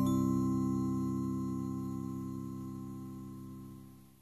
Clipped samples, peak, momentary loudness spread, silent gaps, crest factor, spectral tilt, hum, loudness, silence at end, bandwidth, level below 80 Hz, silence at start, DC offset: under 0.1%; -20 dBFS; 17 LU; none; 16 dB; -8.5 dB/octave; none; -36 LUFS; 0.15 s; 13.5 kHz; -60 dBFS; 0 s; under 0.1%